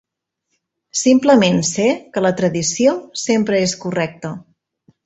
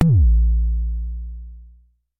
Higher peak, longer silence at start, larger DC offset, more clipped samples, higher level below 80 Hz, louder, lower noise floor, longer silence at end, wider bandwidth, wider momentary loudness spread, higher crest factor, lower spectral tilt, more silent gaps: about the same, -2 dBFS vs -2 dBFS; first, 0.95 s vs 0 s; neither; neither; second, -56 dBFS vs -20 dBFS; first, -16 LUFS vs -20 LUFS; first, -75 dBFS vs -52 dBFS; about the same, 0.65 s vs 0.55 s; first, 8.4 kHz vs 1.4 kHz; second, 12 LU vs 22 LU; about the same, 16 dB vs 16 dB; second, -4.5 dB/octave vs -10.5 dB/octave; neither